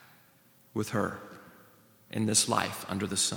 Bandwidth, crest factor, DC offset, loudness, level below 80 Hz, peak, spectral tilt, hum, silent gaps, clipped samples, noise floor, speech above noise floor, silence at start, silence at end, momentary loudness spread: over 20 kHz; 22 dB; under 0.1%; -30 LUFS; -70 dBFS; -10 dBFS; -3 dB/octave; none; none; under 0.1%; -62 dBFS; 32 dB; 0.75 s; 0 s; 20 LU